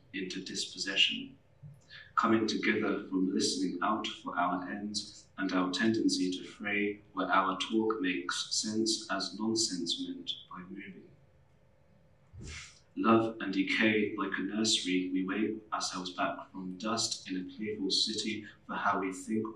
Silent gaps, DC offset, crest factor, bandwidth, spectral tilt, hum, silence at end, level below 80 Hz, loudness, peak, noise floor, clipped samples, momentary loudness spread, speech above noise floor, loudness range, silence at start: none; under 0.1%; 20 dB; 12.5 kHz; -3 dB/octave; none; 0 s; -68 dBFS; -32 LUFS; -12 dBFS; -66 dBFS; under 0.1%; 13 LU; 33 dB; 5 LU; 0.15 s